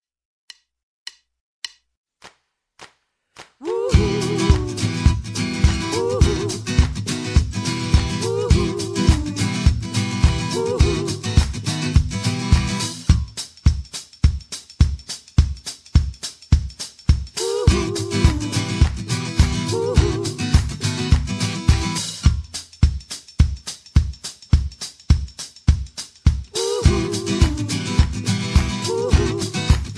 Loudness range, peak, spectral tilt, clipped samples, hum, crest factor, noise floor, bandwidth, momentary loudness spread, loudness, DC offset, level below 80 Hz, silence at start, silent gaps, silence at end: 3 LU; 0 dBFS; -5.5 dB/octave; under 0.1%; none; 18 dB; -64 dBFS; 11 kHz; 10 LU; -21 LUFS; under 0.1%; -24 dBFS; 1.65 s; 1.97-2.04 s; 0 s